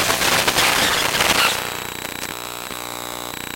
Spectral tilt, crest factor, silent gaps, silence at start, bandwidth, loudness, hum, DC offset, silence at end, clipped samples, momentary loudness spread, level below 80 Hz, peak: -1 dB/octave; 20 dB; none; 0 s; 17 kHz; -19 LUFS; 60 Hz at -45 dBFS; under 0.1%; 0 s; under 0.1%; 13 LU; -46 dBFS; -2 dBFS